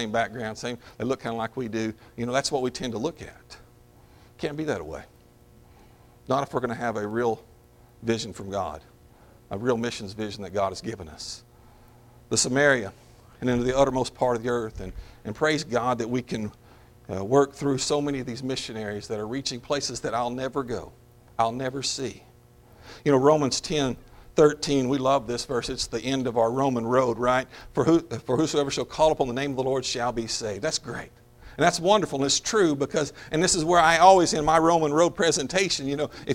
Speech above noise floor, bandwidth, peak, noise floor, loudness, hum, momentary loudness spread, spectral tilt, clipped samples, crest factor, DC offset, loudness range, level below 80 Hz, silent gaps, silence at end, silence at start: 29 dB; 16.5 kHz; -2 dBFS; -54 dBFS; -25 LUFS; none; 14 LU; -4 dB/octave; under 0.1%; 24 dB; under 0.1%; 11 LU; -50 dBFS; none; 0 s; 0 s